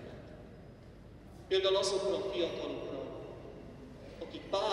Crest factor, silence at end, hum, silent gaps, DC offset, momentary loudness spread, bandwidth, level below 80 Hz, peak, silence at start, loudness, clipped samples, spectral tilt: 20 dB; 0 s; none; none; under 0.1%; 23 LU; 11.5 kHz; -58 dBFS; -18 dBFS; 0 s; -35 LUFS; under 0.1%; -4 dB/octave